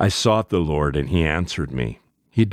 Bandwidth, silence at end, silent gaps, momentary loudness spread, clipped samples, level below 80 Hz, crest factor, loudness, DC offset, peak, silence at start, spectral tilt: 14.5 kHz; 0 s; none; 8 LU; under 0.1%; -34 dBFS; 18 dB; -22 LUFS; under 0.1%; -4 dBFS; 0 s; -5.5 dB/octave